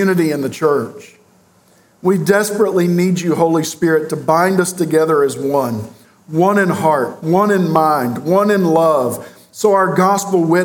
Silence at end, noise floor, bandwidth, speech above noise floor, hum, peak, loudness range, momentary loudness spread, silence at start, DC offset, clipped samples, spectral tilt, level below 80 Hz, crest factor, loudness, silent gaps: 0 s; -51 dBFS; 18.5 kHz; 37 dB; none; 0 dBFS; 2 LU; 6 LU; 0 s; under 0.1%; under 0.1%; -6 dB/octave; -64 dBFS; 14 dB; -15 LUFS; none